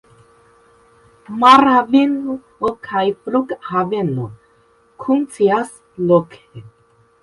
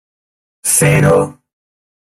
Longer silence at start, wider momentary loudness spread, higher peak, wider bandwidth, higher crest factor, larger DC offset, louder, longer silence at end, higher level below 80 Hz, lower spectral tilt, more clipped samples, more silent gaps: first, 1.3 s vs 0.65 s; first, 17 LU vs 11 LU; about the same, 0 dBFS vs 0 dBFS; second, 11.5 kHz vs 16 kHz; about the same, 18 dB vs 16 dB; neither; second, -16 LUFS vs -12 LUFS; second, 0.55 s vs 0.85 s; second, -58 dBFS vs -42 dBFS; first, -6.5 dB/octave vs -5 dB/octave; neither; neither